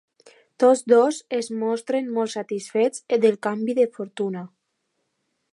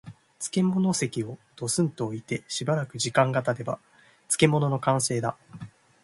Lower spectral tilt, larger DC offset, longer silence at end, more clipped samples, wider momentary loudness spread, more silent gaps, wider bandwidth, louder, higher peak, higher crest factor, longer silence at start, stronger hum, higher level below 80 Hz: about the same, -5 dB/octave vs -5 dB/octave; neither; first, 1.05 s vs 0.35 s; neither; second, 11 LU vs 14 LU; neither; about the same, 11.5 kHz vs 11.5 kHz; first, -22 LUFS vs -26 LUFS; about the same, -6 dBFS vs -6 dBFS; about the same, 18 dB vs 22 dB; first, 0.6 s vs 0.05 s; neither; second, -80 dBFS vs -64 dBFS